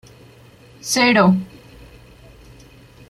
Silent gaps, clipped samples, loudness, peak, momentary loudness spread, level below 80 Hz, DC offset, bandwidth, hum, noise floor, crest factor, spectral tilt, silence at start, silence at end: none; under 0.1%; -16 LUFS; -2 dBFS; 21 LU; -52 dBFS; under 0.1%; 14.5 kHz; none; -46 dBFS; 20 dB; -4.5 dB/octave; 0.85 s; 1.65 s